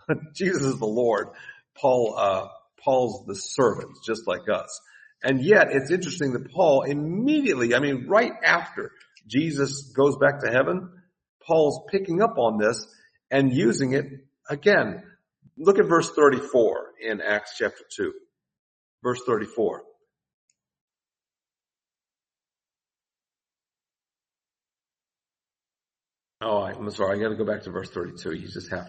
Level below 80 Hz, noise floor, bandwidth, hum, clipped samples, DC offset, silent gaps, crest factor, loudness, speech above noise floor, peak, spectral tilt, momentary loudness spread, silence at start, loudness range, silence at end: -66 dBFS; under -90 dBFS; 8.8 kHz; none; under 0.1%; under 0.1%; 11.29-11.40 s, 18.59-18.98 s, 20.34-20.48 s, 20.81-20.88 s; 22 dB; -24 LUFS; over 67 dB; -4 dBFS; -5.5 dB/octave; 14 LU; 0.1 s; 10 LU; 0 s